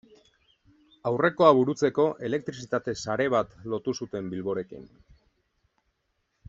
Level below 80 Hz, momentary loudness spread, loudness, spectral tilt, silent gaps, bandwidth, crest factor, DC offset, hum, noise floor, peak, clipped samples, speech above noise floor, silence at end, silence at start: -64 dBFS; 14 LU; -26 LUFS; -6 dB/octave; none; 8 kHz; 24 dB; under 0.1%; none; -76 dBFS; -4 dBFS; under 0.1%; 50 dB; 1.65 s; 1.05 s